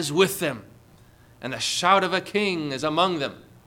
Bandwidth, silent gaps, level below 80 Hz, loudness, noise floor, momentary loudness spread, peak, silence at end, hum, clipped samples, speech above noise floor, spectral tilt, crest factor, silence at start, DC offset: 19 kHz; none; -62 dBFS; -23 LUFS; -53 dBFS; 13 LU; -6 dBFS; 0.25 s; none; under 0.1%; 29 dB; -3.5 dB/octave; 18 dB; 0 s; under 0.1%